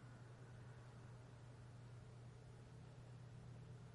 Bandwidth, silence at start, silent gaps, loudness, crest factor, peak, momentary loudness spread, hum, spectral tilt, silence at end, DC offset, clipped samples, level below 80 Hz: 11 kHz; 0 s; none; -60 LUFS; 10 dB; -48 dBFS; 2 LU; none; -6.5 dB/octave; 0 s; under 0.1%; under 0.1%; -74 dBFS